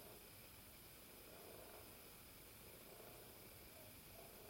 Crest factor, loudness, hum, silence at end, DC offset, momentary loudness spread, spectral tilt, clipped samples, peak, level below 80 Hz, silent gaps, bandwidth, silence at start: 14 dB; -59 LUFS; none; 0 s; under 0.1%; 2 LU; -3 dB/octave; under 0.1%; -46 dBFS; -74 dBFS; none; 16.5 kHz; 0 s